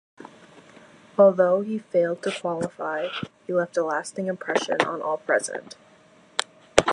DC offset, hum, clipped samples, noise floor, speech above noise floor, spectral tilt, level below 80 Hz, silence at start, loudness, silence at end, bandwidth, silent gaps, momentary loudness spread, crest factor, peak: under 0.1%; none; under 0.1%; -55 dBFS; 31 dB; -4 dB/octave; -56 dBFS; 0.2 s; -25 LUFS; 0 s; 11.5 kHz; none; 12 LU; 26 dB; 0 dBFS